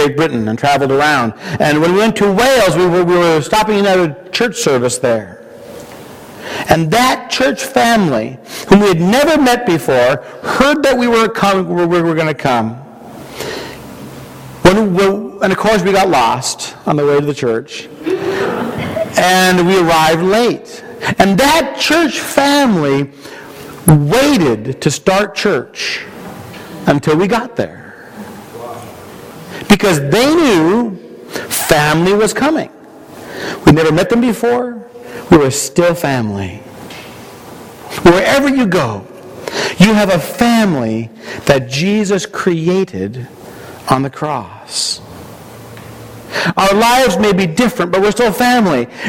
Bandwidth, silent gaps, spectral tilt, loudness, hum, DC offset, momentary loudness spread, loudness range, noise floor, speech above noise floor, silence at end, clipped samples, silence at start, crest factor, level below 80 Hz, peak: 17.5 kHz; none; -5 dB/octave; -12 LUFS; none; under 0.1%; 21 LU; 5 LU; -34 dBFS; 22 dB; 0 s; under 0.1%; 0 s; 14 dB; -40 dBFS; 0 dBFS